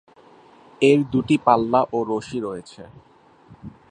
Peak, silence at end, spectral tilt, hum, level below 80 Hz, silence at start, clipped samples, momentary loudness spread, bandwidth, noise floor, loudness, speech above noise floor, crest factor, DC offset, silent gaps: -2 dBFS; 0.2 s; -6.5 dB/octave; none; -56 dBFS; 0.8 s; under 0.1%; 14 LU; 10 kHz; -50 dBFS; -20 LUFS; 30 dB; 20 dB; under 0.1%; none